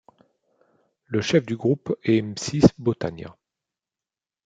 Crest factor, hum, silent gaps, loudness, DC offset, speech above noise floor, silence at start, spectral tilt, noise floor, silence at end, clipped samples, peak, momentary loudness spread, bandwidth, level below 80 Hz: 24 dB; none; none; -23 LUFS; under 0.1%; over 68 dB; 1.1 s; -6 dB/octave; under -90 dBFS; 1.15 s; under 0.1%; -2 dBFS; 12 LU; 9.2 kHz; -52 dBFS